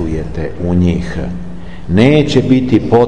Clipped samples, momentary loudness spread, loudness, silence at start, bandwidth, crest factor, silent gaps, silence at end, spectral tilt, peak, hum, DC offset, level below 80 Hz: under 0.1%; 16 LU; -13 LUFS; 0 s; 9.4 kHz; 12 dB; none; 0 s; -7.5 dB/octave; 0 dBFS; none; 5%; -30 dBFS